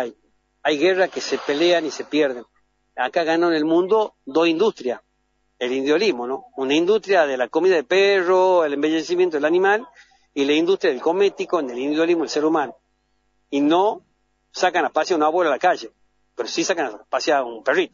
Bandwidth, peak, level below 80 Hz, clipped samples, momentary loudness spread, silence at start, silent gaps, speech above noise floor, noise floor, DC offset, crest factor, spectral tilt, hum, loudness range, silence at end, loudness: 7.4 kHz; -4 dBFS; -72 dBFS; under 0.1%; 10 LU; 0 s; none; 49 dB; -68 dBFS; under 0.1%; 16 dB; -4 dB/octave; none; 3 LU; 0.05 s; -20 LUFS